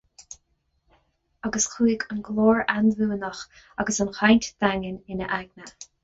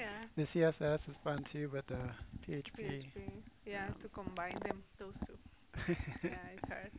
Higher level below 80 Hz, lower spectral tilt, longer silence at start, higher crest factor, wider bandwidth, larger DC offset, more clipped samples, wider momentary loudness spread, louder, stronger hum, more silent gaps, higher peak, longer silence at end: first, -52 dBFS vs -58 dBFS; second, -4 dB/octave vs -6 dB/octave; first, 0.2 s vs 0 s; about the same, 20 dB vs 20 dB; first, 8 kHz vs 4 kHz; neither; neither; first, 23 LU vs 15 LU; first, -24 LUFS vs -42 LUFS; neither; neither; first, -6 dBFS vs -20 dBFS; first, 0.2 s vs 0 s